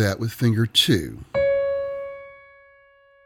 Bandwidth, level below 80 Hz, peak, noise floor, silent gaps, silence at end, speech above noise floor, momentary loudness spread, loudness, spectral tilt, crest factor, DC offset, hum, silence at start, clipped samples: 18 kHz; -50 dBFS; -6 dBFS; -55 dBFS; none; 0.9 s; 34 dB; 15 LU; -22 LUFS; -5 dB/octave; 18 dB; under 0.1%; none; 0 s; under 0.1%